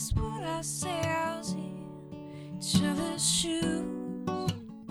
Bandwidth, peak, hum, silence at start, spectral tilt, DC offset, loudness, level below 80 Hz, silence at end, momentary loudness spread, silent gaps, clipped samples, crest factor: over 20 kHz; -12 dBFS; none; 0 s; -4 dB/octave; under 0.1%; -31 LUFS; -46 dBFS; 0 s; 16 LU; none; under 0.1%; 20 dB